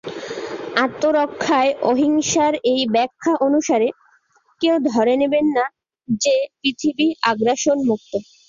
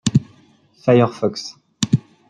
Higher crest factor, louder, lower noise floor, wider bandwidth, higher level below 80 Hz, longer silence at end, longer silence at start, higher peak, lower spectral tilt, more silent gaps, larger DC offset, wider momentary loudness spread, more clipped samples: about the same, 16 dB vs 18 dB; about the same, -19 LUFS vs -19 LUFS; first, -59 dBFS vs -53 dBFS; second, 7.6 kHz vs 11 kHz; second, -60 dBFS vs -52 dBFS; about the same, 0.25 s vs 0.3 s; about the same, 0.05 s vs 0.05 s; about the same, -2 dBFS vs -2 dBFS; second, -3.5 dB/octave vs -6 dB/octave; neither; neither; second, 7 LU vs 13 LU; neither